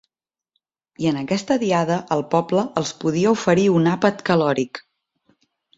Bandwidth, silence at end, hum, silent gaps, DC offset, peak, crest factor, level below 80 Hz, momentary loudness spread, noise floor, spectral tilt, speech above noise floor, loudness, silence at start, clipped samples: 8 kHz; 1 s; none; none; under 0.1%; -2 dBFS; 18 dB; -60 dBFS; 7 LU; -85 dBFS; -6 dB/octave; 66 dB; -20 LUFS; 1 s; under 0.1%